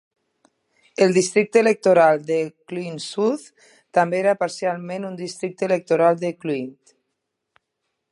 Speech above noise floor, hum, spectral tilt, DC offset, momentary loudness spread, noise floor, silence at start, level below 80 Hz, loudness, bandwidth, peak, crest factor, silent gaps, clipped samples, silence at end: 58 dB; none; -5 dB/octave; under 0.1%; 14 LU; -78 dBFS; 1 s; -76 dBFS; -21 LUFS; 11.5 kHz; -2 dBFS; 20 dB; none; under 0.1%; 1.4 s